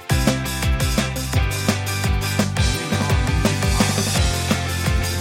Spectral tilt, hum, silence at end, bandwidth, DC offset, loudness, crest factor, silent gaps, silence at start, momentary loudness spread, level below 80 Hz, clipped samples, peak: -4.5 dB/octave; none; 0 s; 16.5 kHz; under 0.1%; -20 LUFS; 16 dB; none; 0 s; 3 LU; -26 dBFS; under 0.1%; -2 dBFS